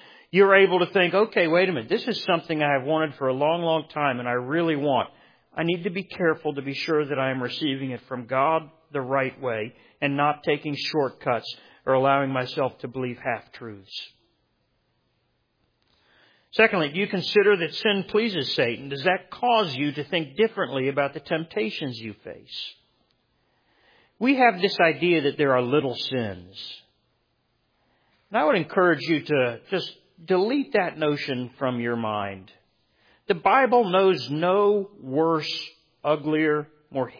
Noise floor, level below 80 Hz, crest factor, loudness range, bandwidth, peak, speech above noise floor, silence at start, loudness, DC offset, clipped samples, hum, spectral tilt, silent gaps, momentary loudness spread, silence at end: -71 dBFS; -70 dBFS; 22 dB; 6 LU; 5.2 kHz; -4 dBFS; 47 dB; 0.35 s; -24 LUFS; under 0.1%; under 0.1%; none; -6.5 dB/octave; none; 15 LU; 0.1 s